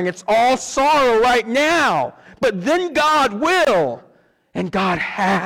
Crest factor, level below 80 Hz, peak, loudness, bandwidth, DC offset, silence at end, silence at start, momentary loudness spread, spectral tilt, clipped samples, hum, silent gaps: 8 dB; -50 dBFS; -10 dBFS; -17 LUFS; 18 kHz; under 0.1%; 0 s; 0 s; 9 LU; -4 dB/octave; under 0.1%; none; none